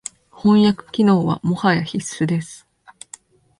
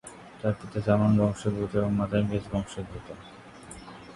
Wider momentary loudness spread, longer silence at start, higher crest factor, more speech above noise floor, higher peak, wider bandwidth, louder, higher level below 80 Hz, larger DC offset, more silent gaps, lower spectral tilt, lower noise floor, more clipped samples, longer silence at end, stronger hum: about the same, 22 LU vs 21 LU; first, 0.45 s vs 0.05 s; about the same, 16 dB vs 20 dB; first, 28 dB vs 19 dB; first, -2 dBFS vs -8 dBFS; about the same, 11.5 kHz vs 11.5 kHz; first, -18 LUFS vs -27 LUFS; second, -56 dBFS vs -50 dBFS; neither; neither; second, -6 dB/octave vs -7.5 dB/octave; about the same, -45 dBFS vs -46 dBFS; neither; first, 1.05 s vs 0 s; neither